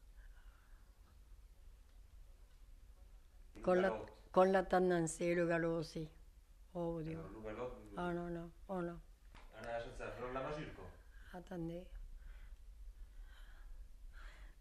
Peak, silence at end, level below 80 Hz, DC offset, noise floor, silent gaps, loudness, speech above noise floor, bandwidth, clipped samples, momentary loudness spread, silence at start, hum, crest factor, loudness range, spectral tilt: -20 dBFS; 0 s; -58 dBFS; under 0.1%; -62 dBFS; none; -40 LUFS; 23 dB; 13.5 kHz; under 0.1%; 26 LU; 0 s; none; 24 dB; 16 LU; -6 dB/octave